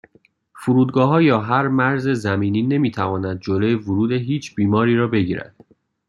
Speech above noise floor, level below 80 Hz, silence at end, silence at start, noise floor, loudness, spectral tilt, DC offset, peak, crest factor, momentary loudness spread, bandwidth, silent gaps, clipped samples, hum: 39 dB; -58 dBFS; 0.65 s; 0.55 s; -57 dBFS; -19 LUFS; -8 dB/octave; under 0.1%; -2 dBFS; 16 dB; 7 LU; 11.5 kHz; none; under 0.1%; none